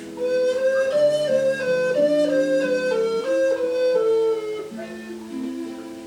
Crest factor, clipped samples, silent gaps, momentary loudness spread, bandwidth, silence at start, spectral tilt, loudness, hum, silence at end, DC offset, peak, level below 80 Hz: 12 dB; under 0.1%; none; 13 LU; 12 kHz; 0 s; -4.5 dB/octave; -21 LUFS; none; 0 s; under 0.1%; -10 dBFS; -64 dBFS